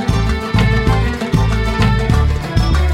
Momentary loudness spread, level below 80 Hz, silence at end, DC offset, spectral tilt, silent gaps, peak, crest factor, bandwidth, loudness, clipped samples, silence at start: 3 LU; -18 dBFS; 0 s; under 0.1%; -6.5 dB/octave; none; 0 dBFS; 14 dB; 13.5 kHz; -15 LUFS; under 0.1%; 0 s